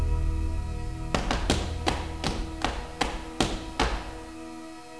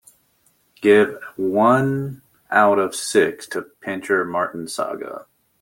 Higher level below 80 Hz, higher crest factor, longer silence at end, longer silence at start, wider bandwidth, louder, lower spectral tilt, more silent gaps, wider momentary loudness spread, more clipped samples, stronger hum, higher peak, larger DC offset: first, -32 dBFS vs -64 dBFS; first, 24 dB vs 18 dB; second, 0 s vs 0.4 s; second, 0 s vs 0.8 s; second, 11 kHz vs 17 kHz; second, -30 LUFS vs -20 LUFS; about the same, -4.5 dB/octave vs -5 dB/octave; neither; about the same, 13 LU vs 14 LU; neither; neither; second, -6 dBFS vs -2 dBFS; first, 0.3% vs under 0.1%